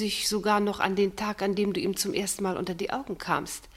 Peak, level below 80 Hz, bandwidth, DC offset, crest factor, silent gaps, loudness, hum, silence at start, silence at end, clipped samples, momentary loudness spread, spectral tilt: -8 dBFS; -56 dBFS; 16 kHz; under 0.1%; 20 dB; none; -28 LUFS; none; 0 s; 0 s; under 0.1%; 6 LU; -3.5 dB/octave